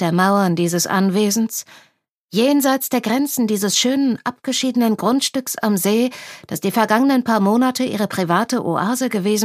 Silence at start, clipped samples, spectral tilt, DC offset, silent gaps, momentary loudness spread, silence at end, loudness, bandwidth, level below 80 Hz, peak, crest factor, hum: 0 s; under 0.1%; -4 dB/octave; under 0.1%; 2.18-2.28 s; 6 LU; 0 s; -18 LUFS; 15.5 kHz; -68 dBFS; 0 dBFS; 18 dB; none